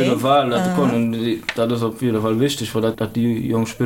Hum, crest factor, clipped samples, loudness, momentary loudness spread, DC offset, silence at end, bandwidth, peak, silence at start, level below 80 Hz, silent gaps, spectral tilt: none; 14 dB; under 0.1%; -19 LUFS; 5 LU; under 0.1%; 0 s; 17 kHz; -4 dBFS; 0 s; -50 dBFS; none; -6 dB/octave